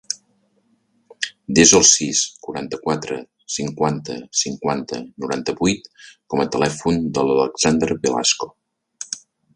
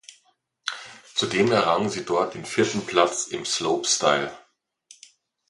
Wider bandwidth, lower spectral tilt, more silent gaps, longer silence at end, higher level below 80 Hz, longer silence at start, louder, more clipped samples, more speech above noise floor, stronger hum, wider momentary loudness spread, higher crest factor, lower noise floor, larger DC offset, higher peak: about the same, 11.5 kHz vs 11.5 kHz; about the same, -3 dB/octave vs -3 dB/octave; neither; second, 0.35 s vs 1.1 s; first, -50 dBFS vs -64 dBFS; second, 0.1 s vs 0.65 s; first, -19 LUFS vs -23 LUFS; neither; about the same, 44 dB vs 43 dB; neither; first, 18 LU vs 12 LU; about the same, 20 dB vs 24 dB; about the same, -63 dBFS vs -66 dBFS; neither; about the same, 0 dBFS vs -2 dBFS